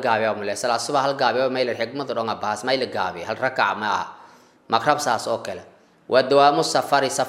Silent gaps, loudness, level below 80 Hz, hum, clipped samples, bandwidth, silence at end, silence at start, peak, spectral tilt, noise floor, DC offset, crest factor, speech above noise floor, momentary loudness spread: none; -22 LUFS; -70 dBFS; none; under 0.1%; 16 kHz; 0 s; 0 s; -2 dBFS; -3.5 dB/octave; -50 dBFS; under 0.1%; 20 dB; 28 dB; 10 LU